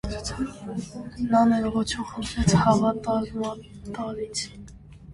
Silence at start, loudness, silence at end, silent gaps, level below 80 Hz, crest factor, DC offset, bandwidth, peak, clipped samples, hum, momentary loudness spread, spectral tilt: 0.05 s; -25 LUFS; 0 s; none; -42 dBFS; 20 dB; under 0.1%; 11.5 kHz; -6 dBFS; under 0.1%; none; 16 LU; -5.5 dB/octave